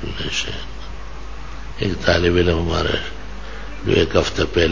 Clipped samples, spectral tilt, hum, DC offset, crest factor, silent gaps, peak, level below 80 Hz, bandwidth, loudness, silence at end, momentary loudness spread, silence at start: under 0.1%; -5 dB/octave; none; 3%; 20 dB; none; 0 dBFS; -30 dBFS; 7.6 kHz; -19 LUFS; 0 s; 19 LU; 0 s